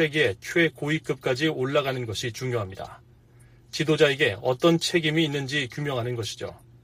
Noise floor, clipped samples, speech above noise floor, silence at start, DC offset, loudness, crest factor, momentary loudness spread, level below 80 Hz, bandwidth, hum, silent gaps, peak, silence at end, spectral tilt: -53 dBFS; under 0.1%; 28 dB; 0 s; under 0.1%; -25 LUFS; 20 dB; 12 LU; -60 dBFS; 15.5 kHz; none; none; -6 dBFS; 0.25 s; -5 dB/octave